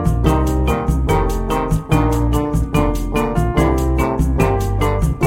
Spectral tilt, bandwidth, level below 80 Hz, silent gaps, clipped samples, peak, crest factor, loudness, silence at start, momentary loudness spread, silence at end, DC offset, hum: -7 dB/octave; 16.5 kHz; -20 dBFS; none; under 0.1%; 0 dBFS; 14 dB; -17 LUFS; 0 s; 3 LU; 0 s; under 0.1%; none